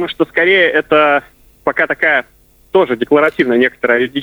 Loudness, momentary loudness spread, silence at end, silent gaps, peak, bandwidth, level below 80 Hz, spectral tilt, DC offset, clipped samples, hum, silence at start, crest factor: -13 LUFS; 6 LU; 0 s; none; 0 dBFS; over 20 kHz; -52 dBFS; -6 dB/octave; under 0.1%; under 0.1%; none; 0 s; 14 dB